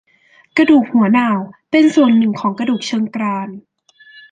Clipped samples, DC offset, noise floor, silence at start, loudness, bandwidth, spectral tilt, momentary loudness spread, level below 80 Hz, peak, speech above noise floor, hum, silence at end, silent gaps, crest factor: under 0.1%; under 0.1%; -52 dBFS; 0.55 s; -15 LUFS; 9.2 kHz; -6 dB/octave; 10 LU; -62 dBFS; -2 dBFS; 38 dB; none; 0.7 s; none; 14 dB